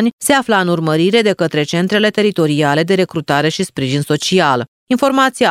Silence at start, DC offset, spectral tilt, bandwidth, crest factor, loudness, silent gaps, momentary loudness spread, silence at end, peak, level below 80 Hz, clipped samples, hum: 0 s; under 0.1%; -5 dB/octave; 16 kHz; 14 dB; -14 LUFS; 0.13-0.18 s, 4.68-4.87 s; 5 LU; 0 s; 0 dBFS; -56 dBFS; under 0.1%; none